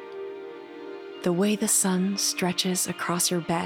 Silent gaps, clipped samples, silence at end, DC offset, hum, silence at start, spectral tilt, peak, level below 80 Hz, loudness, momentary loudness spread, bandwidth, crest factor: none; under 0.1%; 0 s; under 0.1%; none; 0 s; -3.5 dB/octave; -10 dBFS; -68 dBFS; -24 LUFS; 18 LU; 17.5 kHz; 16 dB